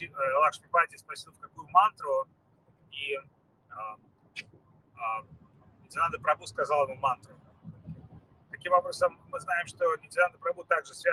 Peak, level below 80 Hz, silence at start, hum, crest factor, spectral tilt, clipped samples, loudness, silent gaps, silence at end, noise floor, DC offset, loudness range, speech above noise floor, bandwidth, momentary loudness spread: -8 dBFS; -70 dBFS; 0 s; none; 22 dB; -3 dB/octave; under 0.1%; -29 LUFS; none; 0 s; -64 dBFS; under 0.1%; 10 LU; 35 dB; 12.5 kHz; 21 LU